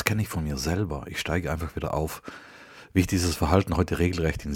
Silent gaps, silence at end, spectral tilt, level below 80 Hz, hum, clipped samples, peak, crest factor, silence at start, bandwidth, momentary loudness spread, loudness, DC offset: none; 0 s; -5.5 dB/octave; -38 dBFS; none; under 0.1%; -2 dBFS; 26 dB; 0 s; 17.5 kHz; 16 LU; -27 LUFS; under 0.1%